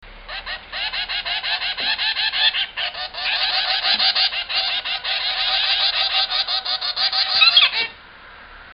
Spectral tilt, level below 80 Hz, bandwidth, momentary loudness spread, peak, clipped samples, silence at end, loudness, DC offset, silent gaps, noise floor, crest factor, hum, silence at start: -3.5 dB/octave; -50 dBFS; 5.8 kHz; 11 LU; 0 dBFS; under 0.1%; 0 s; -18 LUFS; under 0.1%; none; -42 dBFS; 20 dB; none; 0 s